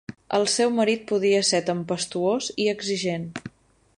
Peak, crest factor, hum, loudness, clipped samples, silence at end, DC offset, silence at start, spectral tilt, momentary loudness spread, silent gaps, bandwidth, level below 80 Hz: -8 dBFS; 18 dB; none; -23 LUFS; under 0.1%; 0.5 s; under 0.1%; 0.1 s; -3.5 dB/octave; 10 LU; none; 11.5 kHz; -64 dBFS